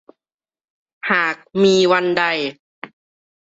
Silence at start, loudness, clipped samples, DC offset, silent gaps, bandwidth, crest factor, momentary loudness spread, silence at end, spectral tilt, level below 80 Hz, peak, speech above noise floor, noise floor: 1.05 s; -17 LUFS; under 0.1%; under 0.1%; 2.59-2.82 s; 8 kHz; 18 dB; 24 LU; 0.75 s; -4.5 dB/octave; -64 dBFS; -2 dBFS; over 73 dB; under -90 dBFS